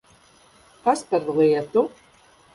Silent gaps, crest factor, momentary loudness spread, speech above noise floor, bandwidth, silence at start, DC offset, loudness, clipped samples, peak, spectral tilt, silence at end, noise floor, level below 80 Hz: none; 16 dB; 6 LU; 34 dB; 11.5 kHz; 0.85 s; under 0.1%; -22 LUFS; under 0.1%; -8 dBFS; -6 dB/octave; 0.65 s; -55 dBFS; -66 dBFS